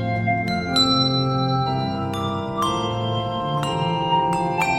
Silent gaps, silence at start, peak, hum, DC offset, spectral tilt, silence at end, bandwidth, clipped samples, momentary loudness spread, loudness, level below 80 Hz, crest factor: none; 0 s; -6 dBFS; none; under 0.1%; -5.5 dB/octave; 0 s; 15.5 kHz; under 0.1%; 7 LU; -21 LUFS; -46 dBFS; 14 dB